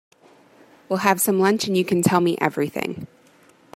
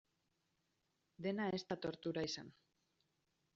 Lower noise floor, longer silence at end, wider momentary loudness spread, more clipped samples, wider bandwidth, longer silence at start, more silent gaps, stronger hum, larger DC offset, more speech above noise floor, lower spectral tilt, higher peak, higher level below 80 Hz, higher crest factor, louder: second, -54 dBFS vs -85 dBFS; second, 0.7 s vs 1.05 s; first, 12 LU vs 7 LU; neither; first, 16 kHz vs 7.4 kHz; second, 0.9 s vs 1.2 s; neither; neither; neither; second, 34 dB vs 42 dB; about the same, -4.5 dB/octave vs -4.5 dB/octave; first, -2 dBFS vs -28 dBFS; first, -64 dBFS vs -80 dBFS; about the same, 20 dB vs 18 dB; first, -21 LUFS vs -43 LUFS